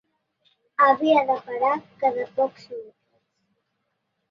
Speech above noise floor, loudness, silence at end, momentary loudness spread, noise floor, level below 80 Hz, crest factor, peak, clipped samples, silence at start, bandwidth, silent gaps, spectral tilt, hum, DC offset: 54 dB; -22 LUFS; 1.45 s; 19 LU; -76 dBFS; -76 dBFS; 18 dB; -6 dBFS; under 0.1%; 0.8 s; 7.4 kHz; none; -5.5 dB/octave; none; under 0.1%